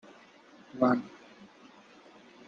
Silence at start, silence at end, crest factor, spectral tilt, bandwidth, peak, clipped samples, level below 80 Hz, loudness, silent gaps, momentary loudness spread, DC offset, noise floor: 0.75 s; 1.05 s; 24 dB; -7.5 dB/octave; 7 kHz; -12 dBFS; under 0.1%; -78 dBFS; -29 LUFS; none; 27 LU; under 0.1%; -56 dBFS